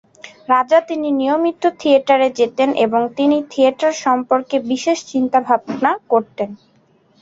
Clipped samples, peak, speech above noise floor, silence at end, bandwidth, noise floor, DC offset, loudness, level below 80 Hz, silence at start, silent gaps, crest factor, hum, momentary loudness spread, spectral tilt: under 0.1%; -2 dBFS; 39 dB; 0.65 s; 7.8 kHz; -55 dBFS; under 0.1%; -17 LUFS; -64 dBFS; 0.25 s; none; 16 dB; none; 5 LU; -4 dB/octave